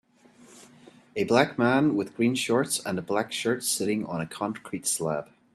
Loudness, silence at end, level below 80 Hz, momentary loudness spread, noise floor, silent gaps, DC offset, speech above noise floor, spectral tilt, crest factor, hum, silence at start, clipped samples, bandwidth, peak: -26 LUFS; 0.3 s; -68 dBFS; 9 LU; -55 dBFS; none; under 0.1%; 29 dB; -4 dB/octave; 22 dB; none; 0.5 s; under 0.1%; 15 kHz; -6 dBFS